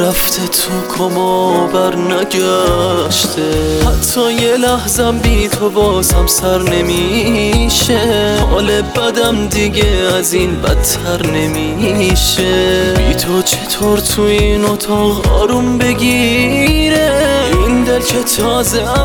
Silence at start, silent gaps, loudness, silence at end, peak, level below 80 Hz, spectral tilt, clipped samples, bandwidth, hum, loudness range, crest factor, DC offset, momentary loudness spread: 0 s; none; -12 LUFS; 0 s; 0 dBFS; -20 dBFS; -4 dB/octave; under 0.1%; over 20 kHz; none; 1 LU; 12 dB; under 0.1%; 3 LU